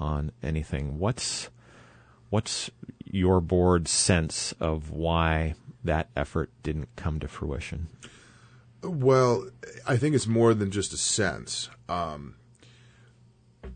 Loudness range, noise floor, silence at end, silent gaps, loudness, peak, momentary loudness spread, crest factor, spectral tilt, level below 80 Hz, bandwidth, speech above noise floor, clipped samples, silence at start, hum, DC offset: 6 LU; -59 dBFS; 0 s; none; -27 LUFS; -8 dBFS; 13 LU; 20 dB; -4.5 dB/octave; -44 dBFS; 9.6 kHz; 32 dB; under 0.1%; 0 s; none; under 0.1%